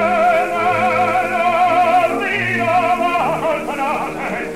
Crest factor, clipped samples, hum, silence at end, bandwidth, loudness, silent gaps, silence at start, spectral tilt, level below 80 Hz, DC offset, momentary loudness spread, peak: 12 dB; under 0.1%; none; 0 s; 15.5 kHz; -16 LUFS; none; 0 s; -5 dB/octave; -50 dBFS; 0.6%; 6 LU; -4 dBFS